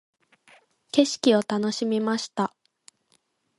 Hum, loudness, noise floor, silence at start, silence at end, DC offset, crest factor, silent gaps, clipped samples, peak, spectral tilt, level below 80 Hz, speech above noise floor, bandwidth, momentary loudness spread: none; -24 LUFS; -69 dBFS; 0.95 s; 1.1 s; under 0.1%; 22 dB; none; under 0.1%; -4 dBFS; -4.5 dB/octave; -74 dBFS; 45 dB; 11.5 kHz; 8 LU